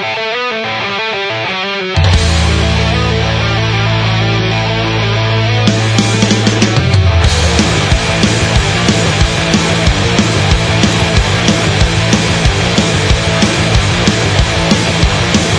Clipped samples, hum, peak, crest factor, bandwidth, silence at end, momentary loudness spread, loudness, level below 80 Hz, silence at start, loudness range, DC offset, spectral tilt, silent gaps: under 0.1%; none; 0 dBFS; 10 dB; 10.5 kHz; 0 s; 5 LU; -11 LUFS; -20 dBFS; 0 s; 2 LU; under 0.1%; -4.5 dB/octave; none